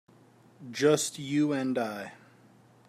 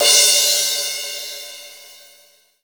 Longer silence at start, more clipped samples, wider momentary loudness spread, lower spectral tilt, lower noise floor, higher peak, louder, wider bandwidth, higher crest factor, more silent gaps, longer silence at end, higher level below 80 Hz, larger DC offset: first, 0.6 s vs 0 s; neither; second, 17 LU vs 24 LU; first, -4.5 dB/octave vs 3.5 dB/octave; first, -59 dBFS vs -53 dBFS; second, -10 dBFS vs 0 dBFS; second, -28 LUFS vs -14 LUFS; second, 15 kHz vs over 20 kHz; about the same, 20 dB vs 20 dB; neither; about the same, 0.75 s vs 0.7 s; about the same, -78 dBFS vs -76 dBFS; neither